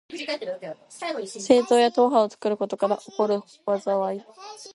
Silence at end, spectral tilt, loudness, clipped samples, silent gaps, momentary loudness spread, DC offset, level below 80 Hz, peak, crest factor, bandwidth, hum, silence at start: 0.05 s; -4.5 dB/octave; -24 LUFS; under 0.1%; none; 17 LU; under 0.1%; -76 dBFS; -4 dBFS; 20 dB; 11.5 kHz; none; 0.1 s